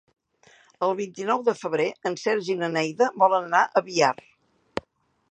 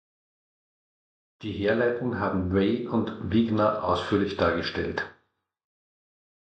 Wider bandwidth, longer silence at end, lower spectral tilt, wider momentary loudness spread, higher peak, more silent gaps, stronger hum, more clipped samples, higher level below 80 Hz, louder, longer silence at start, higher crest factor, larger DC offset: about the same, 9.2 kHz vs 8.4 kHz; second, 0.5 s vs 1.3 s; second, -4 dB/octave vs -7.5 dB/octave; first, 15 LU vs 7 LU; first, -4 dBFS vs -10 dBFS; neither; neither; neither; second, -68 dBFS vs -48 dBFS; about the same, -24 LUFS vs -26 LUFS; second, 0.8 s vs 1.4 s; about the same, 20 dB vs 18 dB; neither